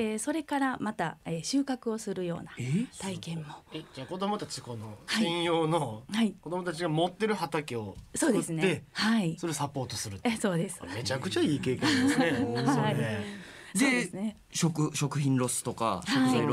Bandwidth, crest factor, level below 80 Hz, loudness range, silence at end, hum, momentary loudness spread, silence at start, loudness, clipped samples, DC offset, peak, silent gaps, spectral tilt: 16 kHz; 18 dB; -64 dBFS; 6 LU; 0 s; none; 11 LU; 0 s; -30 LUFS; under 0.1%; under 0.1%; -12 dBFS; none; -4.5 dB/octave